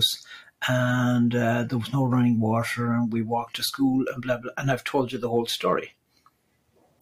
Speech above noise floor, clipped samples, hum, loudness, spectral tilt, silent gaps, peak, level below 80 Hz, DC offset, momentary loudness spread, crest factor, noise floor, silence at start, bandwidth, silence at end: 43 dB; under 0.1%; none; -25 LUFS; -5.5 dB/octave; none; -10 dBFS; -58 dBFS; under 0.1%; 7 LU; 16 dB; -67 dBFS; 0 s; 15.5 kHz; 1.15 s